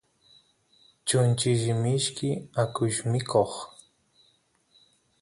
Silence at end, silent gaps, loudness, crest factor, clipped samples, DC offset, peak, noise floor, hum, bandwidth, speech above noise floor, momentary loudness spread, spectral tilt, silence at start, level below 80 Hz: 1.55 s; none; -26 LUFS; 20 dB; under 0.1%; under 0.1%; -8 dBFS; -67 dBFS; none; 11.5 kHz; 41 dB; 8 LU; -5 dB/octave; 1.05 s; -62 dBFS